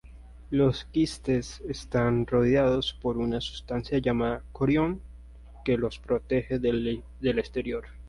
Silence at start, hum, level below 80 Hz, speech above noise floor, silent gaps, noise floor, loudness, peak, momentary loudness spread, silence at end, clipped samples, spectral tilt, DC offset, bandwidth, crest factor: 0.05 s; none; -44 dBFS; 20 dB; none; -47 dBFS; -28 LUFS; -12 dBFS; 9 LU; 0 s; under 0.1%; -7 dB/octave; under 0.1%; 11.5 kHz; 14 dB